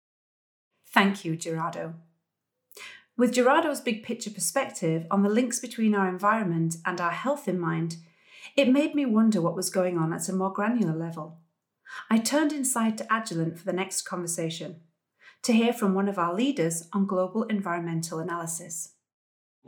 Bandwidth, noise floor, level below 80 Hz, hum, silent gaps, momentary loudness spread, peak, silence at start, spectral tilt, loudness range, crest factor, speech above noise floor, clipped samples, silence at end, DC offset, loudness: 19.5 kHz; -83 dBFS; -82 dBFS; none; none; 13 LU; -2 dBFS; 0.9 s; -4.5 dB/octave; 3 LU; 24 dB; 56 dB; under 0.1%; 0.8 s; under 0.1%; -27 LUFS